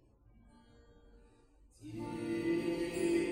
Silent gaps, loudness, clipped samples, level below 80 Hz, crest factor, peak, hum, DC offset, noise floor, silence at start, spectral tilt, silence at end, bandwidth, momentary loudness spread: none; -37 LUFS; under 0.1%; -62 dBFS; 16 dB; -22 dBFS; none; under 0.1%; -64 dBFS; 1.15 s; -5.5 dB/octave; 0 s; 16 kHz; 14 LU